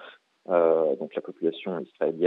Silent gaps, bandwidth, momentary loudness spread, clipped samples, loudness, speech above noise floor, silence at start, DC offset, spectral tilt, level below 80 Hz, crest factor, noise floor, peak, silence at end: none; 4.1 kHz; 12 LU; under 0.1%; -26 LUFS; 17 dB; 0 s; under 0.1%; -8.5 dB/octave; under -90 dBFS; 18 dB; -46 dBFS; -8 dBFS; 0 s